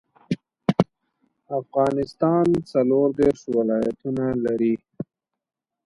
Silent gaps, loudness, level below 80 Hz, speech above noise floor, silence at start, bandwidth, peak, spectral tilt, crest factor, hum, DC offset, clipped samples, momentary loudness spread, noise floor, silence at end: none; -23 LUFS; -56 dBFS; 49 dB; 0.3 s; 11 kHz; -2 dBFS; -8.5 dB/octave; 22 dB; none; under 0.1%; under 0.1%; 12 LU; -70 dBFS; 0.85 s